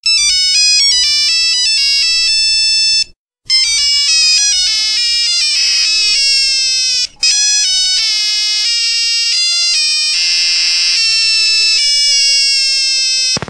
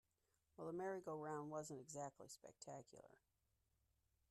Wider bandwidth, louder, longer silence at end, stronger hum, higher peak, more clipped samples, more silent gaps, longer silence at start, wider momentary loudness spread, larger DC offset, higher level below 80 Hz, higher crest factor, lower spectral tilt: about the same, 14.5 kHz vs 13.5 kHz; first, -9 LUFS vs -52 LUFS; second, 0 s vs 1.15 s; neither; first, 0 dBFS vs -38 dBFS; neither; first, 3.18-3.26 s vs none; second, 0.05 s vs 0.6 s; second, 3 LU vs 12 LU; neither; first, -46 dBFS vs -86 dBFS; about the same, 12 dB vs 16 dB; second, 3 dB/octave vs -5 dB/octave